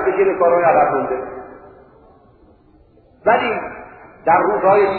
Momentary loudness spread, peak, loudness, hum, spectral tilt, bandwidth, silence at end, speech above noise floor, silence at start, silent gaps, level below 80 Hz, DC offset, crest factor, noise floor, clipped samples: 18 LU; -2 dBFS; -16 LUFS; none; -10.5 dB/octave; 4.4 kHz; 0 s; 36 dB; 0 s; none; -52 dBFS; under 0.1%; 16 dB; -50 dBFS; under 0.1%